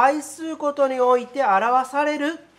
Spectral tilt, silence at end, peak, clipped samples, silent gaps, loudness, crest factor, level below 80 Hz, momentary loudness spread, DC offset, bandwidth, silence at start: -3.5 dB/octave; 0.2 s; -4 dBFS; under 0.1%; none; -21 LUFS; 16 dB; -74 dBFS; 8 LU; under 0.1%; 14 kHz; 0 s